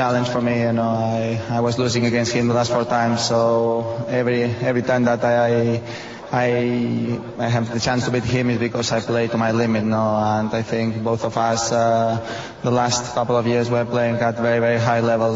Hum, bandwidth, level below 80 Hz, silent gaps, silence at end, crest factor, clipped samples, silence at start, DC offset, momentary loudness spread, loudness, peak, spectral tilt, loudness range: none; 8 kHz; -52 dBFS; none; 0 s; 14 dB; under 0.1%; 0 s; under 0.1%; 5 LU; -20 LUFS; -6 dBFS; -5.5 dB/octave; 2 LU